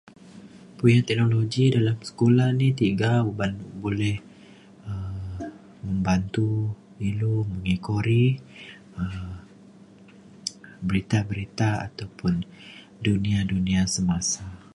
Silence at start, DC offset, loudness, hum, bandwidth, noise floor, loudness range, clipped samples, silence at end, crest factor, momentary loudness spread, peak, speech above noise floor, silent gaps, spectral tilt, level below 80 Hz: 0.25 s; under 0.1%; -25 LUFS; none; 11.5 kHz; -49 dBFS; 7 LU; under 0.1%; 0.15 s; 18 dB; 16 LU; -6 dBFS; 26 dB; none; -6 dB/octave; -46 dBFS